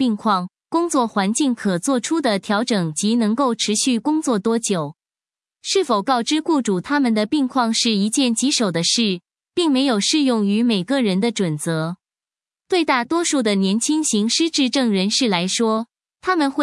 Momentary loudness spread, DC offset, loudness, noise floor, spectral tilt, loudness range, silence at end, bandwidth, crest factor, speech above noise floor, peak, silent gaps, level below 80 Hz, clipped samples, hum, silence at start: 5 LU; under 0.1%; -19 LUFS; under -90 dBFS; -4 dB/octave; 2 LU; 0 s; 12 kHz; 16 dB; over 71 dB; -2 dBFS; none; -68 dBFS; under 0.1%; none; 0 s